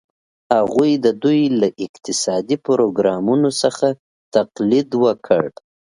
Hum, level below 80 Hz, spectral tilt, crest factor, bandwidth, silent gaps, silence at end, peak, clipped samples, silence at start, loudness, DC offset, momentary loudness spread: none; -62 dBFS; -5 dB/octave; 18 dB; 11 kHz; 1.89-1.94 s, 3.99-4.32 s; 0.35 s; 0 dBFS; under 0.1%; 0.5 s; -18 LUFS; under 0.1%; 5 LU